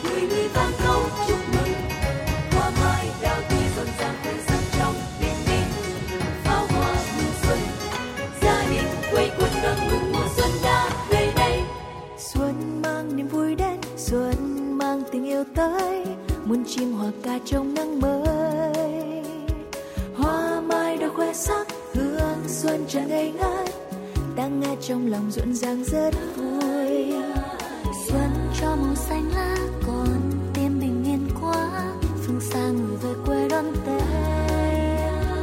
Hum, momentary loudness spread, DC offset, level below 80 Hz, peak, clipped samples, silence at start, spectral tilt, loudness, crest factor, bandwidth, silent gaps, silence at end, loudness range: none; 7 LU; under 0.1%; -32 dBFS; -6 dBFS; under 0.1%; 0 s; -5.5 dB/octave; -24 LUFS; 16 dB; 16.5 kHz; none; 0 s; 3 LU